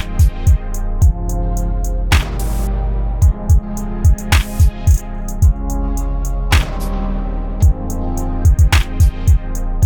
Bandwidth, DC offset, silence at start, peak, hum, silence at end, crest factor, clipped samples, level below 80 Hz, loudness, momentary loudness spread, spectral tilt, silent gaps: 19.5 kHz; under 0.1%; 0 s; 0 dBFS; none; 0 s; 14 dB; under 0.1%; -16 dBFS; -17 LUFS; 9 LU; -5.5 dB/octave; none